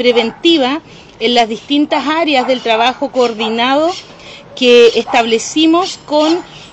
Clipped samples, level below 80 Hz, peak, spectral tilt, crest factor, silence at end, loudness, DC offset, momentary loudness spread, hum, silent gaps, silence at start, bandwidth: under 0.1%; -52 dBFS; 0 dBFS; -3 dB/octave; 12 dB; 0.05 s; -12 LUFS; under 0.1%; 8 LU; none; none; 0 s; 8.6 kHz